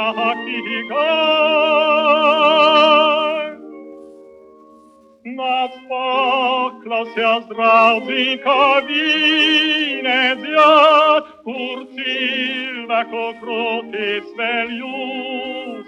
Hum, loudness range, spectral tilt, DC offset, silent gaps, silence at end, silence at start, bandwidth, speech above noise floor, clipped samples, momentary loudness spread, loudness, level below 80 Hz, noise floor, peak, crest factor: none; 8 LU; -3.5 dB/octave; under 0.1%; none; 0.05 s; 0 s; 8.8 kHz; 31 dB; under 0.1%; 14 LU; -16 LUFS; -70 dBFS; -48 dBFS; -2 dBFS; 16 dB